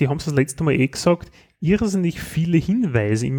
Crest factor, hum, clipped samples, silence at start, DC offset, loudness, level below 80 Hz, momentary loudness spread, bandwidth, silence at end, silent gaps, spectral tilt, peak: 16 dB; none; under 0.1%; 0 s; under 0.1%; -20 LUFS; -44 dBFS; 5 LU; 19 kHz; 0 s; none; -6.5 dB/octave; -4 dBFS